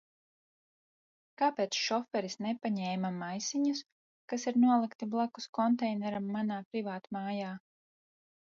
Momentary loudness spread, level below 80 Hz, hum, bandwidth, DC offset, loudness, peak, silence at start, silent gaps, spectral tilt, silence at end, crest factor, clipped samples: 10 LU; -82 dBFS; none; 7.6 kHz; under 0.1%; -33 LUFS; -16 dBFS; 1.4 s; 3.92-4.28 s, 4.95-4.99 s, 5.49-5.53 s, 6.65-6.71 s; -4.5 dB/octave; 0.9 s; 18 dB; under 0.1%